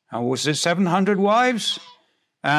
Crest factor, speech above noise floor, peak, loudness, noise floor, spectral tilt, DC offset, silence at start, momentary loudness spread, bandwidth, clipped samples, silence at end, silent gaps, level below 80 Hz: 16 dB; 42 dB; -6 dBFS; -20 LUFS; -62 dBFS; -4.5 dB/octave; under 0.1%; 0.1 s; 8 LU; 14 kHz; under 0.1%; 0 s; none; -74 dBFS